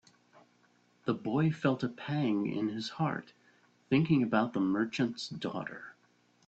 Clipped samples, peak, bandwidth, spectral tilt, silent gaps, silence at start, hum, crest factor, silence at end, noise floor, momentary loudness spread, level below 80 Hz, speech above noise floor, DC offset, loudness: under 0.1%; -14 dBFS; 8.2 kHz; -7 dB/octave; none; 1.05 s; 60 Hz at -60 dBFS; 20 dB; 0.55 s; -68 dBFS; 12 LU; -70 dBFS; 37 dB; under 0.1%; -32 LUFS